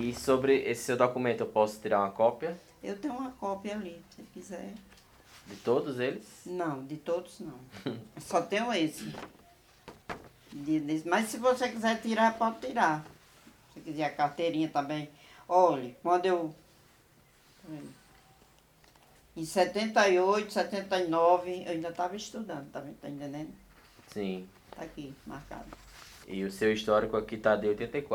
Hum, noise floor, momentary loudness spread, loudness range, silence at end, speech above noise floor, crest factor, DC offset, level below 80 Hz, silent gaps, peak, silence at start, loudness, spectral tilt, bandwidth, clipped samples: none; -62 dBFS; 20 LU; 11 LU; 0 s; 32 dB; 22 dB; under 0.1%; -64 dBFS; none; -10 dBFS; 0 s; -30 LUFS; -5 dB/octave; 19.5 kHz; under 0.1%